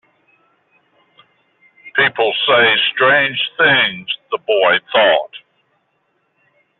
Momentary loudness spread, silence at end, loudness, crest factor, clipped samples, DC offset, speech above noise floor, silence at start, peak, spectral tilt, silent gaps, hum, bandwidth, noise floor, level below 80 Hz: 10 LU; 1.4 s; -14 LUFS; 16 dB; under 0.1%; under 0.1%; 51 dB; 1.85 s; -2 dBFS; 0.5 dB/octave; none; none; 4.3 kHz; -65 dBFS; -66 dBFS